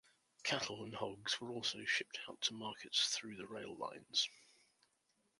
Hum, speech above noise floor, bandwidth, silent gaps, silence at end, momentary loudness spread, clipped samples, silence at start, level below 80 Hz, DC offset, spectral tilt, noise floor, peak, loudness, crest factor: none; 39 dB; 11.5 kHz; none; 0.95 s; 11 LU; under 0.1%; 0.4 s; -82 dBFS; under 0.1%; -1.5 dB/octave; -81 dBFS; -20 dBFS; -40 LUFS; 24 dB